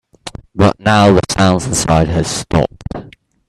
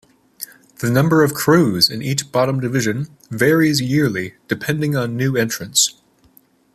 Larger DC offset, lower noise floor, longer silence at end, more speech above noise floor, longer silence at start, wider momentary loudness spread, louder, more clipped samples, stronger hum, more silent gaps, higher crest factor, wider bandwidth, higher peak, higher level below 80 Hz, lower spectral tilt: neither; second, -36 dBFS vs -54 dBFS; second, 0.4 s vs 0.85 s; second, 24 dB vs 37 dB; second, 0.25 s vs 0.4 s; first, 18 LU vs 12 LU; first, -13 LUFS vs -17 LUFS; neither; neither; neither; about the same, 14 dB vs 18 dB; second, 13 kHz vs 15 kHz; about the same, 0 dBFS vs 0 dBFS; first, -34 dBFS vs -54 dBFS; about the same, -5 dB/octave vs -4.5 dB/octave